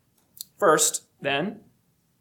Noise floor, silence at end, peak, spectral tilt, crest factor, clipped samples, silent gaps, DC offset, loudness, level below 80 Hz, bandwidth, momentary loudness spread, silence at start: -67 dBFS; 0.6 s; -6 dBFS; -2 dB/octave; 20 dB; under 0.1%; none; under 0.1%; -23 LUFS; -74 dBFS; 19 kHz; 20 LU; 0.6 s